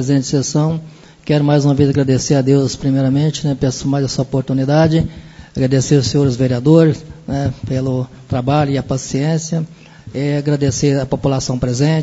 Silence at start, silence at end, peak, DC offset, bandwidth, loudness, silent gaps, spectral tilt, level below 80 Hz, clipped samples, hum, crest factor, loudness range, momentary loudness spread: 0 s; 0 s; 0 dBFS; under 0.1%; 8 kHz; -16 LUFS; none; -6.5 dB/octave; -40 dBFS; under 0.1%; none; 16 dB; 4 LU; 9 LU